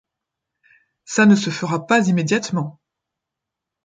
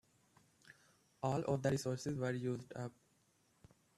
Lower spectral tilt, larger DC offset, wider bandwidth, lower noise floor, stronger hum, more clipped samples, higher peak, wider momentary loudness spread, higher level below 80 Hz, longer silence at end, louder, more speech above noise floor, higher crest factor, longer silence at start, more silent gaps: about the same, -5.5 dB/octave vs -6.5 dB/octave; neither; second, 9.2 kHz vs 13.5 kHz; first, -84 dBFS vs -75 dBFS; neither; neither; first, -2 dBFS vs -22 dBFS; about the same, 11 LU vs 11 LU; first, -64 dBFS vs -74 dBFS; about the same, 1.15 s vs 1.1 s; first, -18 LUFS vs -40 LUFS; first, 66 dB vs 36 dB; about the same, 18 dB vs 20 dB; first, 1.1 s vs 0.65 s; neither